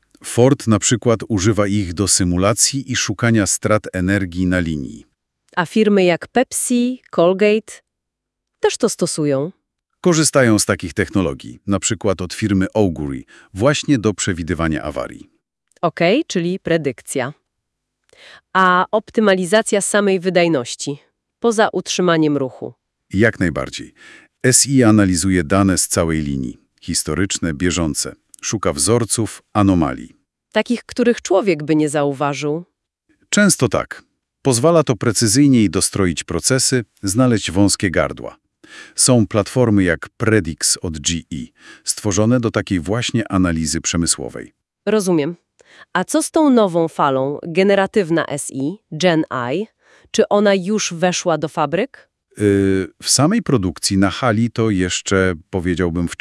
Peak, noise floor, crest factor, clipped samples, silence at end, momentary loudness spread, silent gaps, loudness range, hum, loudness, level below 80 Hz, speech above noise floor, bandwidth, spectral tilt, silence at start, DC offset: 0 dBFS; -79 dBFS; 18 dB; under 0.1%; 0.05 s; 10 LU; none; 4 LU; none; -17 LUFS; -46 dBFS; 63 dB; 12 kHz; -4.5 dB/octave; 0.25 s; under 0.1%